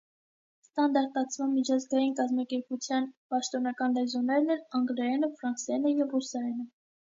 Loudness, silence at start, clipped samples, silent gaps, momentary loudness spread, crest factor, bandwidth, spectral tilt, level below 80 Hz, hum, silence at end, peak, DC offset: -30 LUFS; 0.75 s; under 0.1%; 3.17-3.30 s; 7 LU; 16 dB; 7.8 kHz; -3 dB/octave; -86 dBFS; none; 0.5 s; -14 dBFS; under 0.1%